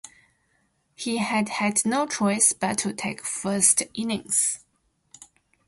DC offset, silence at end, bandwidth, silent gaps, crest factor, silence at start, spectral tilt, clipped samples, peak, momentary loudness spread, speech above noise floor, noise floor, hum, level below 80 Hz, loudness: under 0.1%; 1.1 s; 12 kHz; none; 24 dB; 0.05 s; -2.5 dB/octave; under 0.1%; -4 dBFS; 11 LU; 45 dB; -70 dBFS; none; -66 dBFS; -23 LUFS